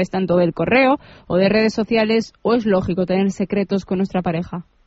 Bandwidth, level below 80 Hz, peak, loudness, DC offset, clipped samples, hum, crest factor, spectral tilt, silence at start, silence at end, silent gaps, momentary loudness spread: 8 kHz; -46 dBFS; -4 dBFS; -18 LUFS; under 0.1%; under 0.1%; none; 16 dB; -5.5 dB/octave; 0 s; 0.25 s; none; 7 LU